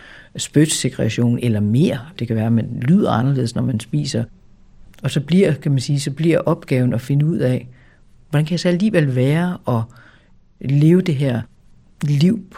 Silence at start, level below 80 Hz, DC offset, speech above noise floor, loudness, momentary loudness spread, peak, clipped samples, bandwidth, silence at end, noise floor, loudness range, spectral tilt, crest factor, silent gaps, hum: 0.15 s; -50 dBFS; under 0.1%; 33 dB; -18 LUFS; 9 LU; -2 dBFS; under 0.1%; 15 kHz; 0 s; -50 dBFS; 2 LU; -6.5 dB/octave; 16 dB; none; none